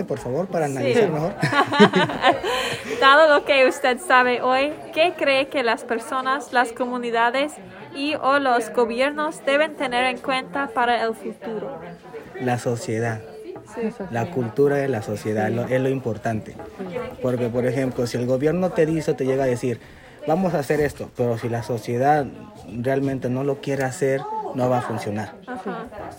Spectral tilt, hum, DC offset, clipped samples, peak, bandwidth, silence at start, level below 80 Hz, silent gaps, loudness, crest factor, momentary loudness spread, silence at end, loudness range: -5.5 dB/octave; none; under 0.1%; under 0.1%; 0 dBFS; 16.5 kHz; 0 s; -56 dBFS; none; -21 LUFS; 22 dB; 14 LU; 0 s; 7 LU